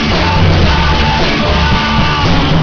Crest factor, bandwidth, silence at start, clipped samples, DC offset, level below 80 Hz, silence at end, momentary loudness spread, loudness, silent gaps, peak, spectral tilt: 10 dB; 5.4 kHz; 0 s; 0.1%; under 0.1%; -16 dBFS; 0 s; 1 LU; -11 LUFS; none; 0 dBFS; -6 dB/octave